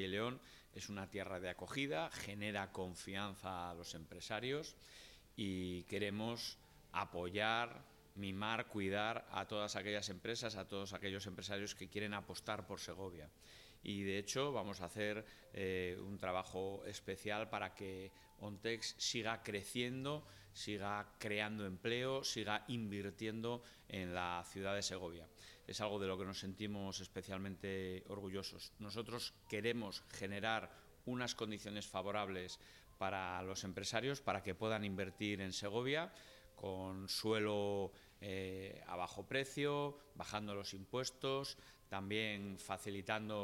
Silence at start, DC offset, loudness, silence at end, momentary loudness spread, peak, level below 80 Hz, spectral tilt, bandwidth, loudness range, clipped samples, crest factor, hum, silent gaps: 0 s; under 0.1%; -44 LUFS; 0 s; 10 LU; -22 dBFS; -70 dBFS; -4 dB/octave; 16.5 kHz; 3 LU; under 0.1%; 22 dB; none; none